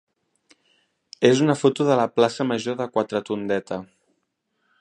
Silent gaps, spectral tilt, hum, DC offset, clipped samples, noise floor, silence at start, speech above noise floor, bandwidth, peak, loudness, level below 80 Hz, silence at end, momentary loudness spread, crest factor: none; -5.5 dB/octave; none; under 0.1%; under 0.1%; -74 dBFS; 1.2 s; 53 dB; 10.5 kHz; -2 dBFS; -22 LUFS; -68 dBFS; 0.95 s; 8 LU; 22 dB